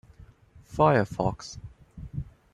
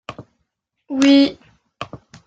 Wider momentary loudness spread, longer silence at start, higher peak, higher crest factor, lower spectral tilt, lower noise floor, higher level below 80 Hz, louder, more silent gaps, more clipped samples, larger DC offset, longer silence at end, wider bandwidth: about the same, 23 LU vs 22 LU; first, 0.7 s vs 0.1 s; second, -8 dBFS vs -2 dBFS; about the same, 22 dB vs 18 dB; first, -7 dB/octave vs -4 dB/octave; second, -54 dBFS vs -73 dBFS; first, -50 dBFS vs -58 dBFS; second, -25 LUFS vs -15 LUFS; neither; neither; neither; about the same, 0.3 s vs 0.3 s; first, 12 kHz vs 9 kHz